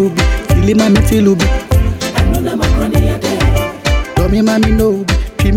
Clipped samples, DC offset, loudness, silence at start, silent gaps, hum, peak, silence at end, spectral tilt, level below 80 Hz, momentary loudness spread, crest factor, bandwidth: under 0.1%; under 0.1%; -13 LUFS; 0 s; none; none; 0 dBFS; 0 s; -6 dB/octave; -16 dBFS; 5 LU; 12 dB; 16.5 kHz